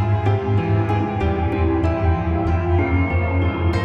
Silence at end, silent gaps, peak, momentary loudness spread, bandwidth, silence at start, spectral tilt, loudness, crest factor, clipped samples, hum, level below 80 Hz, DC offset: 0 s; none; -6 dBFS; 2 LU; 5.6 kHz; 0 s; -9 dB/octave; -20 LUFS; 12 dB; under 0.1%; none; -32 dBFS; under 0.1%